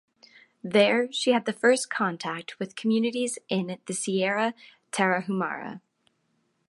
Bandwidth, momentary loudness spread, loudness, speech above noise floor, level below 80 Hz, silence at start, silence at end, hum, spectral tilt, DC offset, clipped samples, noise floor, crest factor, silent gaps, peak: 11.5 kHz; 12 LU; -26 LUFS; 46 dB; -80 dBFS; 0.65 s; 0.9 s; none; -4 dB/octave; under 0.1%; under 0.1%; -72 dBFS; 20 dB; none; -8 dBFS